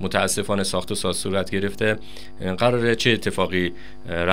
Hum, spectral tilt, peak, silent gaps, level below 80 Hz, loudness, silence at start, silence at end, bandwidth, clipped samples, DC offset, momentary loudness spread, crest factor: none; -4 dB/octave; 0 dBFS; none; -48 dBFS; -23 LUFS; 0 s; 0 s; 16 kHz; under 0.1%; 3%; 10 LU; 22 dB